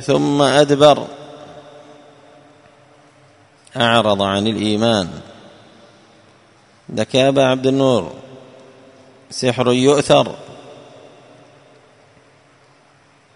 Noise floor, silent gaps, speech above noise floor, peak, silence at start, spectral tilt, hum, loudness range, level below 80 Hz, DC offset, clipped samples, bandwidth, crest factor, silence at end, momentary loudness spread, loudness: -52 dBFS; none; 37 dB; 0 dBFS; 0 s; -5 dB/octave; none; 4 LU; -56 dBFS; under 0.1%; under 0.1%; 11 kHz; 18 dB; 2.6 s; 24 LU; -15 LUFS